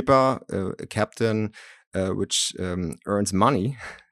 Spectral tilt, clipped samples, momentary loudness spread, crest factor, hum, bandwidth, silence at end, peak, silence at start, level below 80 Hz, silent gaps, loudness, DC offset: -4.5 dB/octave; under 0.1%; 10 LU; 20 dB; none; 15 kHz; 0.15 s; -4 dBFS; 0 s; -56 dBFS; 1.87-1.91 s; -25 LUFS; under 0.1%